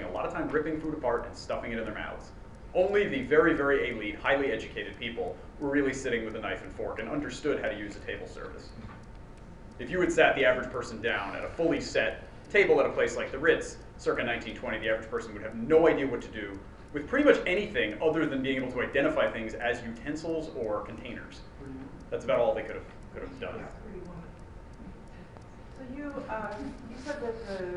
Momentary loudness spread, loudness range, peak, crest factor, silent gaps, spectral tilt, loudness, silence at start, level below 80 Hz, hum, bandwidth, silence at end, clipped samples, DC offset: 21 LU; 9 LU; -8 dBFS; 24 dB; none; -5 dB/octave; -30 LUFS; 0 s; -50 dBFS; none; 11 kHz; 0 s; under 0.1%; 0.1%